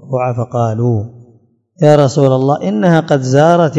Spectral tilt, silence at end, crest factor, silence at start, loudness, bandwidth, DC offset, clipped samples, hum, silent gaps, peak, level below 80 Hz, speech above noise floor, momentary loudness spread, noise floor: -7.5 dB/octave; 0 s; 12 dB; 0.05 s; -12 LUFS; 8.8 kHz; under 0.1%; 0.7%; none; none; 0 dBFS; -56 dBFS; 39 dB; 8 LU; -50 dBFS